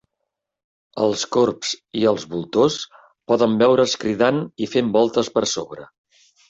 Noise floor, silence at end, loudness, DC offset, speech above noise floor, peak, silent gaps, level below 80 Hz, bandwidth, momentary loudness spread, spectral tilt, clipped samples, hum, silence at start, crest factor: -80 dBFS; 0.65 s; -20 LUFS; under 0.1%; 60 dB; -4 dBFS; none; -60 dBFS; 8.2 kHz; 11 LU; -4.5 dB/octave; under 0.1%; none; 0.95 s; 18 dB